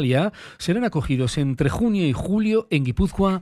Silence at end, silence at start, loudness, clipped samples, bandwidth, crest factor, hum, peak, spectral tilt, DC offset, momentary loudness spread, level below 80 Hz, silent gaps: 0 s; 0 s; -22 LUFS; under 0.1%; 13 kHz; 14 dB; none; -6 dBFS; -7 dB/octave; under 0.1%; 3 LU; -36 dBFS; none